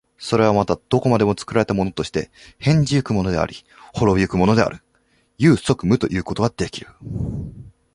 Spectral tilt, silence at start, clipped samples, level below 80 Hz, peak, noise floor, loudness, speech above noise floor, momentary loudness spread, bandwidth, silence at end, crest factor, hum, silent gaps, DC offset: -6.5 dB/octave; 0.2 s; under 0.1%; -40 dBFS; -2 dBFS; -62 dBFS; -20 LUFS; 43 dB; 12 LU; 11.5 kHz; 0.25 s; 18 dB; none; none; under 0.1%